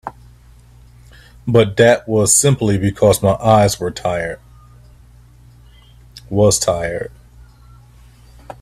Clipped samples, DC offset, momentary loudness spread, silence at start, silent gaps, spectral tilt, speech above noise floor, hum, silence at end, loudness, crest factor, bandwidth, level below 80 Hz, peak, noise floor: under 0.1%; under 0.1%; 15 LU; 0.05 s; none; -4.5 dB/octave; 30 dB; 60 Hz at -45 dBFS; 0.1 s; -15 LUFS; 18 dB; 16 kHz; -42 dBFS; 0 dBFS; -44 dBFS